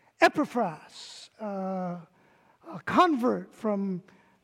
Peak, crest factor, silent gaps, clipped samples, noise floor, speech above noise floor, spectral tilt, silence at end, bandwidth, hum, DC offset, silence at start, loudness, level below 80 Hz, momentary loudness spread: -8 dBFS; 22 dB; none; under 0.1%; -62 dBFS; 34 dB; -5.5 dB/octave; 0.4 s; 16 kHz; none; under 0.1%; 0.2 s; -28 LUFS; -72 dBFS; 20 LU